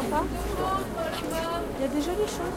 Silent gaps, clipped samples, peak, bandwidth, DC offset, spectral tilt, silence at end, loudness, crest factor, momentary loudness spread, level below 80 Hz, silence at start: none; under 0.1%; -12 dBFS; 16.5 kHz; under 0.1%; -5 dB/octave; 0 s; -29 LUFS; 16 dB; 3 LU; -40 dBFS; 0 s